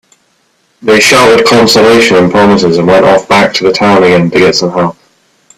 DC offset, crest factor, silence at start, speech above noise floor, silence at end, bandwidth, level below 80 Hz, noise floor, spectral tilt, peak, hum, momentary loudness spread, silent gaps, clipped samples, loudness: under 0.1%; 6 dB; 0.85 s; 48 dB; 0.65 s; 15.5 kHz; -42 dBFS; -53 dBFS; -4.5 dB/octave; 0 dBFS; none; 5 LU; none; 0.6%; -6 LUFS